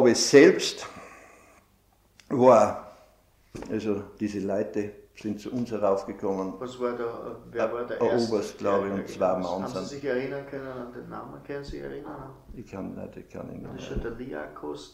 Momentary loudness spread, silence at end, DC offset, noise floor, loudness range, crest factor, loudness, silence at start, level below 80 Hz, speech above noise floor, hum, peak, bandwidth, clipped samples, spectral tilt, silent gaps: 21 LU; 0.05 s; under 0.1%; -63 dBFS; 12 LU; 22 dB; -26 LUFS; 0 s; -52 dBFS; 36 dB; none; -4 dBFS; 15 kHz; under 0.1%; -4.5 dB/octave; none